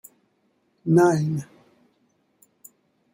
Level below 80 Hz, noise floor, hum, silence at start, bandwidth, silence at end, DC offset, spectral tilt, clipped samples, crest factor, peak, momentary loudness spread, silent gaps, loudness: -68 dBFS; -68 dBFS; none; 0.85 s; 16.5 kHz; 1.7 s; under 0.1%; -7.5 dB/octave; under 0.1%; 20 dB; -6 dBFS; 18 LU; none; -21 LUFS